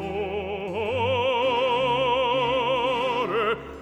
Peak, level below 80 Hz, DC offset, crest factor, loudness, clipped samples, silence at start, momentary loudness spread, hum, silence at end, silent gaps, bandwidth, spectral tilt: -12 dBFS; -52 dBFS; under 0.1%; 12 dB; -24 LUFS; under 0.1%; 0 s; 7 LU; none; 0 s; none; 9 kHz; -5.5 dB/octave